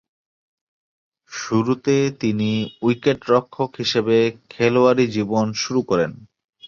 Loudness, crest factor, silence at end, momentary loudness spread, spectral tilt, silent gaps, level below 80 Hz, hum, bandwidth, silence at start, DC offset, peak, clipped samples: -20 LUFS; 18 dB; 0 s; 7 LU; -5.5 dB/octave; 6.44-6.48 s; -58 dBFS; none; 7.4 kHz; 1.3 s; under 0.1%; -4 dBFS; under 0.1%